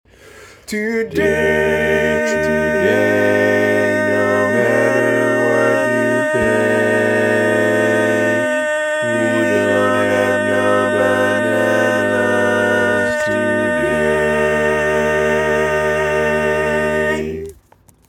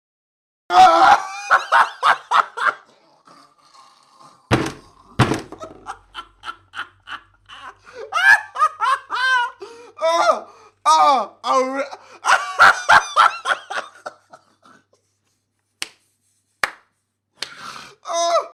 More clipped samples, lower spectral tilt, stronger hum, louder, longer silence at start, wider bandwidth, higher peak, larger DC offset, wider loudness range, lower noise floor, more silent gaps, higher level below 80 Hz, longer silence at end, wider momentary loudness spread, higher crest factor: neither; first, -5 dB/octave vs -3 dB/octave; neither; about the same, -15 LUFS vs -17 LUFS; second, 0.35 s vs 0.7 s; about the same, 17 kHz vs 15.5 kHz; about the same, -2 dBFS vs -2 dBFS; neither; second, 1 LU vs 16 LU; second, -50 dBFS vs -71 dBFS; neither; first, -42 dBFS vs -52 dBFS; first, 0.55 s vs 0.05 s; second, 3 LU vs 24 LU; about the same, 14 dB vs 18 dB